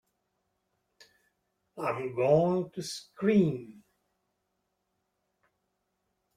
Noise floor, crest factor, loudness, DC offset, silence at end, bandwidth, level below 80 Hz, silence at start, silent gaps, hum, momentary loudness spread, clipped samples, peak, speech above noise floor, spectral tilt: -80 dBFS; 22 dB; -29 LUFS; under 0.1%; 2.65 s; 14.5 kHz; -70 dBFS; 1.75 s; none; none; 13 LU; under 0.1%; -12 dBFS; 52 dB; -7 dB/octave